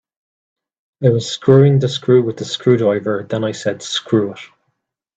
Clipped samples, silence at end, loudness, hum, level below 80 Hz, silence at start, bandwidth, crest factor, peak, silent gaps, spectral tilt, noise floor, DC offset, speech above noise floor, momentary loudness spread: under 0.1%; 0.7 s; -16 LUFS; none; -58 dBFS; 1 s; 8.4 kHz; 16 dB; 0 dBFS; none; -6.5 dB/octave; -72 dBFS; under 0.1%; 57 dB; 11 LU